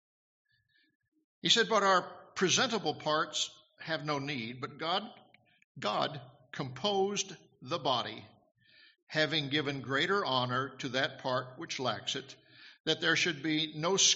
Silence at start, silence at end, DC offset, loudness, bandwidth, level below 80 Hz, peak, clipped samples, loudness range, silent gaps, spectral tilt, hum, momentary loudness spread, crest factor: 1.45 s; 0 s; under 0.1%; -32 LUFS; 8 kHz; -76 dBFS; -10 dBFS; under 0.1%; 6 LU; 5.64-5.75 s, 9.02-9.07 s, 12.80-12.84 s; -1.5 dB/octave; none; 14 LU; 22 dB